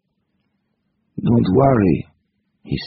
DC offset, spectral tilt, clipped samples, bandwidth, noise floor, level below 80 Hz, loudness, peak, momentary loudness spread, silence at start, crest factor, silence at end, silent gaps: under 0.1%; -8 dB/octave; under 0.1%; 4.9 kHz; -70 dBFS; -42 dBFS; -17 LUFS; 0 dBFS; 20 LU; 1.15 s; 20 dB; 0 s; none